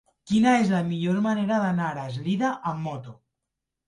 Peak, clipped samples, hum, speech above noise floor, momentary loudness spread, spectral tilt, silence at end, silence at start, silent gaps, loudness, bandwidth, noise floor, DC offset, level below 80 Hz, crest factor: -10 dBFS; under 0.1%; none; 60 dB; 11 LU; -6.5 dB/octave; 0.75 s; 0.25 s; none; -25 LUFS; 11 kHz; -84 dBFS; under 0.1%; -62 dBFS; 14 dB